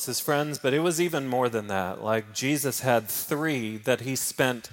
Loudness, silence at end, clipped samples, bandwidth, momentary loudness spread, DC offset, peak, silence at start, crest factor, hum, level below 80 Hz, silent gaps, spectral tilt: -26 LUFS; 0.05 s; under 0.1%; 17 kHz; 4 LU; under 0.1%; -6 dBFS; 0 s; 20 dB; none; -70 dBFS; none; -4 dB/octave